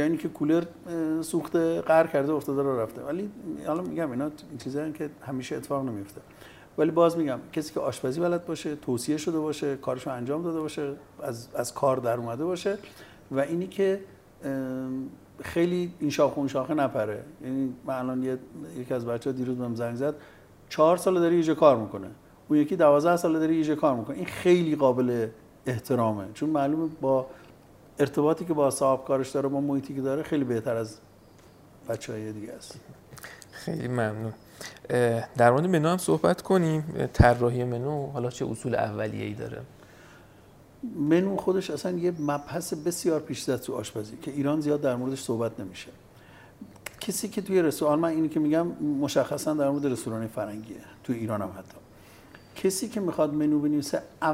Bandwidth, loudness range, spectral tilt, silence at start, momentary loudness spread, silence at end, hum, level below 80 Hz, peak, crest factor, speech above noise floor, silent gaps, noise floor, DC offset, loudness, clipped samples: 16 kHz; 8 LU; -6 dB/octave; 0 s; 15 LU; 0 s; none; -50 dBFS; -4 dBFS; 24 dB; 27 dB; none; -53 dBFS; under 0.1%; -27 LUFS; under 0.1%